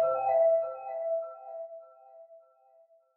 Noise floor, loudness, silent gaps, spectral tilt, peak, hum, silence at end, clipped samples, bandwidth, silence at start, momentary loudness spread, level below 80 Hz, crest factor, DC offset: -63 dBFS; -29 LUFS; none; -8 dB/octave; -18 dBFS; none; 0.8 s; under 0.1%; 2.7 kHz; 0 s; 19 LU; -86 dBFS; 14 dB; under 0.1%